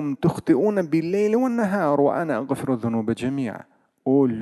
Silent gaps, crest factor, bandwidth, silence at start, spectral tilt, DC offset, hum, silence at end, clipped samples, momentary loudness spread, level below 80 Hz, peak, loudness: none; 14 dB; 12.5 kHz; 0 s; -8 dB/octave; under 0.1%; none; 0 s; under 0.1%; 7 LU; -58 dBFS; -6 dBFS; -22 LUFS